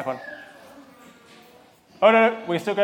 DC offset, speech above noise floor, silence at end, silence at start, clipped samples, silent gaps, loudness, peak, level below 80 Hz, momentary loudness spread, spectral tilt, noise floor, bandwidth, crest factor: under 0.1%; 33 dB; 0 s; 0 s; under 0.1%; none; -20 LUFS; -4 dBFS; -76 dBFS; 22 LU; -5.5 dB/octave; -53 dBFS; 16 kHz; 20 dB